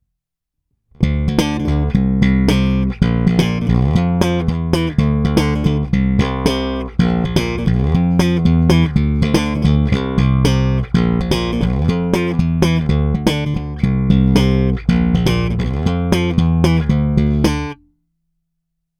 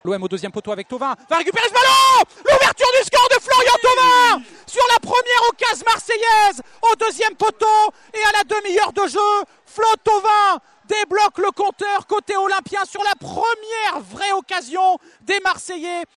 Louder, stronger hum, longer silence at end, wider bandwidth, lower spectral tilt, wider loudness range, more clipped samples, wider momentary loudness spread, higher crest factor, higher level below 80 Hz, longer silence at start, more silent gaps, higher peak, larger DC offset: about the same, -16 LUFS vs -16 LUFS; neither; first, 1.25 s vs 0.1 s; second, 13 kHz vs 14.5 kHz; first, -7 dB/octave vs -1.5 dB/octave; second, 2 LU vs 7 LU; neither; second, 4 LU vs 11 LU; about the same, 14 dB vs 12 dB; first, -24 dBFS vs -54 dBFS; first, 1 s vs 0.05 s; neither; first, 0 dBFS vs -6 dBFS; neither